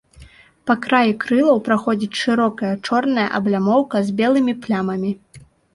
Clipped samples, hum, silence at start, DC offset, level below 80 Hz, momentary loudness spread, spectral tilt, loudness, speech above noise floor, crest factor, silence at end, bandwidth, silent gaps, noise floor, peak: under 0.1%; none; 0.2 s; under 0.1%; -56 dBFS; 7 LU; -6 dB/octave; -18 LUFS; 28 dB; 16 dB; 0.35 s; 11.5 kHz; none; -46 dBFS; -2 dBFS